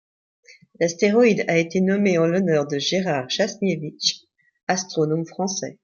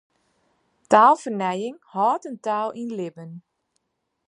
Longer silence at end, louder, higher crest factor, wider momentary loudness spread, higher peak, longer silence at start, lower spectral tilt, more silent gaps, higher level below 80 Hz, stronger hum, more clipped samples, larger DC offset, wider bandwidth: second, 0.1 s vs 0.9 s; about the same, -21 LUFS vs -22 LUFS; second, 16 dB vs 22 dB; second, 8 LU vs 18 LU; second, -6 dBFS vs -2 dBFS; about the same, 0.8 s vs 0.9 s; about the same, -4.5 dB/octave vs -5.5 dB/octave; first, 4.63-4.67 s vs none; first, -68 dBFS vs -78 dBFS; neither; neither; neither; second, 7.2 kHz vs 11 kHz